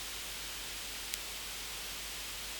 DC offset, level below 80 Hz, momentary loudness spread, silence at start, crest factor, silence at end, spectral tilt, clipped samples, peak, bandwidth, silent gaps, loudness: under 0.1%; -56 dBFS; 1 LU; 0 s; 32 dB; 0 s; 0 dB/octave; under 0.1%; -10 dBFS; over 20 kHz; none; -39 LUFS